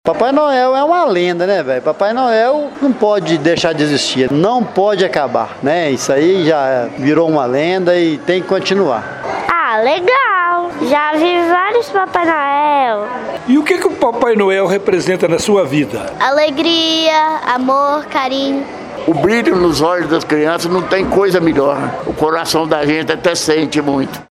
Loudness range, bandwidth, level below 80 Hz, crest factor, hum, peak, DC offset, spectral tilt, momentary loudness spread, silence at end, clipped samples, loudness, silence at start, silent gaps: 1 LU; 15 kHz; -48 dBFS; 14 dB; none; 0 dBFS; under 0.1%; -4.5 dB/octave; 5 LU; 0.1 s; under 0.1%; -13 LUFS; 0.05 s; none